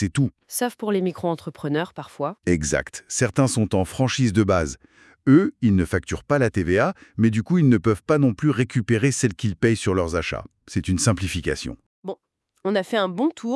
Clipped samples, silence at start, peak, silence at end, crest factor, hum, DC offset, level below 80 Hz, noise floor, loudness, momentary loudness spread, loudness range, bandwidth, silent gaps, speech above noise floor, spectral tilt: under 0.1%; 0 s; -4 dBFS; 0 s; 18 dB; none; under 0.1%; -46 dBFS; -67 dBFS; -22 LUFS; 11 LU; 5 LU; 12 kHz; 11.86-12.03 s; 46 dB; -5.5 dB/octave